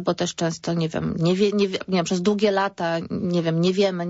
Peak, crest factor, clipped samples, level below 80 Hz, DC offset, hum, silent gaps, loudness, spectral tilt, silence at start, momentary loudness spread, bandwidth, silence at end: -8 dBFS; 14 dB; under 0.1%; -56 dBFS; under 0.1%; none; none; -23 LUFS; -5.5 dB/octave; 0 s; 5 LU; 8 kHz; 0 s